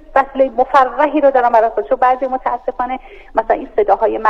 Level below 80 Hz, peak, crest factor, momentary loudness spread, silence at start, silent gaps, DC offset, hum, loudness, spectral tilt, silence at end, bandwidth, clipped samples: -42 dBFS; 0 dBFS; 14 dB; 9 LU; 0.1 s; none; 0.2%; none; -15 LUFS; -5.5 dB/octave; 0 s; 6.6 kHz; under 0.1%